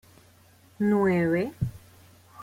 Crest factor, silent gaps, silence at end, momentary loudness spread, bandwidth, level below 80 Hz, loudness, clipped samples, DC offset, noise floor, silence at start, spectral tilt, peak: 16 dB; none; 0 s; 11 LU; 16 kHz; -54 dBFS; -26 LUFS; under 0.1%; under 0.1%; -57 dBFS; 0.8 s; -8.5 dB/octave; -12 dBFS